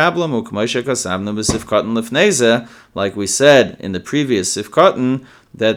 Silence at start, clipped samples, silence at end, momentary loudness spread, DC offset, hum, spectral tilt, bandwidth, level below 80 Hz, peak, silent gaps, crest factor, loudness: 0 s; under 0.1%; 0 s; 9 LU; under 0.1%; none; -4 dB/octave; 17.5 kHz; -46 dBFS; 0 dBFS; none; 16 dB; -16 LUFS